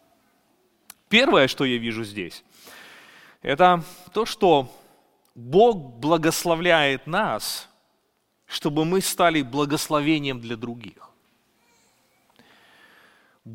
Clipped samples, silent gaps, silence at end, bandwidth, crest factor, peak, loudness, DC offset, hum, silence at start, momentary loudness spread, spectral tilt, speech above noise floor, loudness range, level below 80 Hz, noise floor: under 0.1%; none; 0 s; 17 kHz; 22 dB; -2 dBFS; -22 LUFS; under 0.1%; none; 1.1 s; 16 LU; -4 dB/octave; 48 dB; 7 LU; -54 dBFS; -70 dBFS